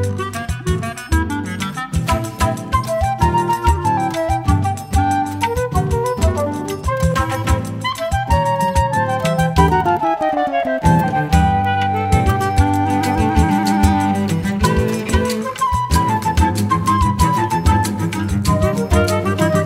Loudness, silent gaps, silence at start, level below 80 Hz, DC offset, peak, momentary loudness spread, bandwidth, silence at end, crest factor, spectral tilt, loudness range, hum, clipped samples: -17 LUFS; none; 0 s; -26 dBFS; under 0.1%; 0 dBFS; 6 LU; 16 kHz; 0 s; 16 dB; -6 dB/octave; 3 LU; none; under 0.1%